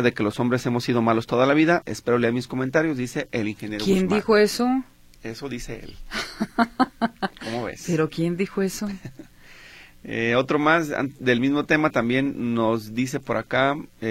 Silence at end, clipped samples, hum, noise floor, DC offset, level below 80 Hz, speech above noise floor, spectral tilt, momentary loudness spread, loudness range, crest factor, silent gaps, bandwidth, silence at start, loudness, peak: 0 s; under 0.1%; none; -47 dBFS; under 0.1%; -50 dBFS; 24 dB; -5.5 dB/octave; 13 LU; 5 LU; 18 dB; none; 16 kHz; 0 s; -23 LUFS; -4 dBFS